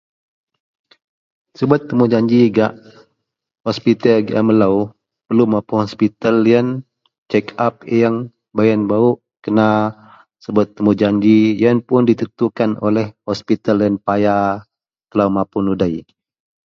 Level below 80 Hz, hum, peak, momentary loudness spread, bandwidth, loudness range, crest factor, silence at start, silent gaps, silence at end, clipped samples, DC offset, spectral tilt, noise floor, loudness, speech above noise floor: -52 dBFS; none; 0 dBFS; 10 LU; 7 kHz; 3 LU; 16 dB; 1.6 s; 7.18-7.26 s; 0.65 s; under 0.1%; under 0.1%; -8 dB/octave; -70 dBFS; -16 LUFS; 55 dB